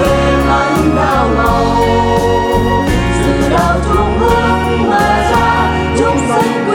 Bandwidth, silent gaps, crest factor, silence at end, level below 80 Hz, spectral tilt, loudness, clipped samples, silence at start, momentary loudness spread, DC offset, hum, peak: 17.5 kHz; none; 10 dB; 0 s; -22 dBFS; -6 dB/octave; -12 LUFS; under 0.1%; 0 s; 2 LU; under 0.1%; none; 0 dBFS